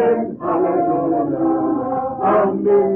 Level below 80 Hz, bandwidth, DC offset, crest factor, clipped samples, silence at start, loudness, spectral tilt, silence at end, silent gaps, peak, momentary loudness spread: -54 dBFS; 3.3 kHz; under 0.1%; 10 dB; under 0.1%; 0 s; -18 LUFS; -11.5 dB/octave; 0 s; none; -6 dBFS; 5 LU